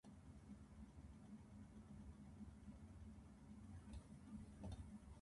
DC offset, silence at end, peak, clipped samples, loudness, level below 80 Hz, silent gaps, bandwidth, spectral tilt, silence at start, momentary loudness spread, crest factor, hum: under 0.1%; 0 s; -42 dBFS; under 0.1%; -60 LUFS; -64 dBFS; none; 11.5 kHz; -7 dB/octave; 0.05 s; 6 LU; 16 dB; none